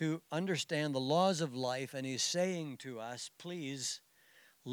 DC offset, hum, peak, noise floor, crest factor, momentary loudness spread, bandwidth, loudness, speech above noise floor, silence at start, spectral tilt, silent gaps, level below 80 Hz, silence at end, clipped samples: under 0.1%; none; -18 dBFS; -65 dBFS; 18 dB; 13 LU; over 20 kHz; -36 LUFS; 29 dB; 0 s; -4 dB/octave; none; under -90 dBFS; 0 s; under 0.1%